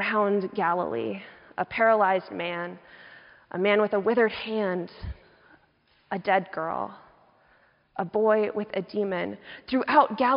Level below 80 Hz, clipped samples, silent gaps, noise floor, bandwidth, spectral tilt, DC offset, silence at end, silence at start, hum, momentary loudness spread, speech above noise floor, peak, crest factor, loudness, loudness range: -56 dBFS; under 0.1%; none; -65 dBFS; 5.4 kHz; -3.5 dB/octave; under 0.1%; 0 s; 0 s; none; 17 LU; 39 dB; -6 dBFS; 20 dB; -26 LUFS; 6 LU